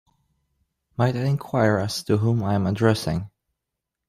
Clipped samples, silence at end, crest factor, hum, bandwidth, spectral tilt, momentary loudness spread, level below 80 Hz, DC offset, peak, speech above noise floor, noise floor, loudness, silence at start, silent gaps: under 0.1%; 0.8 s; 18 dB; none; 14.5 kHz; -6.5 dB/octave; 8 LU; -54 dBFS; under 0.1%; -6 dBFS; 62 dB; -84 dBFS; -23 LUFS; 1 s; none